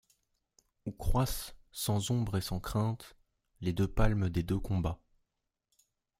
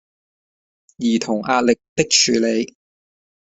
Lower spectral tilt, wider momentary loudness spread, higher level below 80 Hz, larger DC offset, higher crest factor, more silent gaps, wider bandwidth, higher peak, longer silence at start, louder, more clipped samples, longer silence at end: first, -6 dB/octave vs -2.5 dB/octave; first, 13 LU vs 10 LU; first, -42 dBFS vs -58 dBFS; neither; about the same, 22 dB vs 20 dB; second, none vs 1.89-1.96 s; first, 16 kHz vs 8.4 kHz; second, -12 dBFS vs -2 dBFS; second, 0.85 s vs 1 s; second, -34 LUFS vs -18 LUFS; neither; first, 1.25 s vs 0.8 s